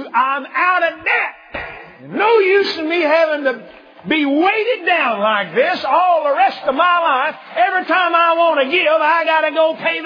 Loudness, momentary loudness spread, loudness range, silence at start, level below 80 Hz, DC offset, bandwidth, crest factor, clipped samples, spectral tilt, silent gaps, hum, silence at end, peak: -15 LUFS; 8 LU; 2 LU; 0 s; -58 dBFS; under 0.1%; 5.2 kHz; 14 dB; under 0.1%; -5 dB/octave; none; none; 0 s; -2 dBFS